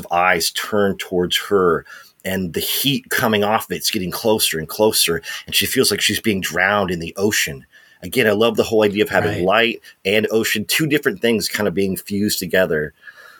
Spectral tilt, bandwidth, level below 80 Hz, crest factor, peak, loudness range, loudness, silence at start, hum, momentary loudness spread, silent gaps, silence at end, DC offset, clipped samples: -3.5 dB/octave; 19 kHz; -54 dBFS; 18 dB; 0 dBFS; 2 LU; -18 LUFS; 0 s; none; 7 LU; none; 0.2 s; under 0.1%; under 0.1%